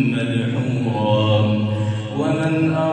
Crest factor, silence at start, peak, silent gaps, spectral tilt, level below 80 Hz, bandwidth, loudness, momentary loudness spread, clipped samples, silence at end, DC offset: 14 dB; 0 s; -6 dBFS; none; -7.5 dB/octave; -58 dBFS; 9 kHz; -19 LUFS; 5 LU; under 0.1%; 0 s; under 0.1%